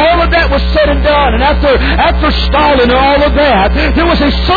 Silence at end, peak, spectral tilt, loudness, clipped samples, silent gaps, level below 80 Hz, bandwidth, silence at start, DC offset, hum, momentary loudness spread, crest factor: 0 s; -2 dBFS; -7.5 dB/octave; -9 LUFS; under 0.1%; none; -14 dBFS; 4.9 kHz; 0 s; under 0.1%; none; 3 LU; 8 dB